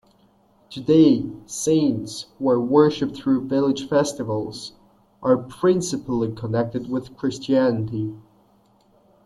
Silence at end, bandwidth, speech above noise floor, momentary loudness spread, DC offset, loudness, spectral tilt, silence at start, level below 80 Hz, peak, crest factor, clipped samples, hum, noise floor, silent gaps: 1.05 s; 12.5 kHz; 38 dB; 13 LU; under 0.1%; -22 LUFS; -6 dB/octave; 0.7 s; -58 dBFS; -4 dBFS; 18 dB; under 0.1%; none; -58 dBFS; none